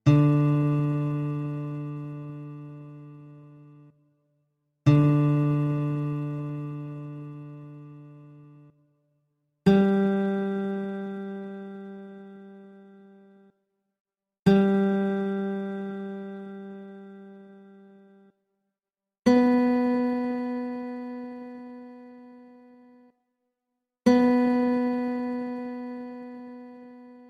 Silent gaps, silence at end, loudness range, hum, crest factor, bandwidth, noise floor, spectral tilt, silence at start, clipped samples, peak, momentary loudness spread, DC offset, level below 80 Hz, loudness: 14.00-14.05 s; 0.05 s; 13 LU; none; 20 dB; 7.2 kHz; under -90 dBFS; -9 dB/octave; 0.05 s; under 0.1%; -8 dBFS; 24 LU; under 0.1%; -60 dBFS; -25 LUFS